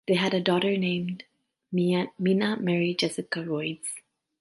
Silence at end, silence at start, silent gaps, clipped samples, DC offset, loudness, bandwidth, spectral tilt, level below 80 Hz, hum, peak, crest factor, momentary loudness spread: 0.4 s; 0.1 s; none; under 0.1%; under 0.1%; -27 LUFS; 11.5 kHz; -5.5 dB/octave; -72 dBFS; none; -8 dBFS; 20 dB; 11 LU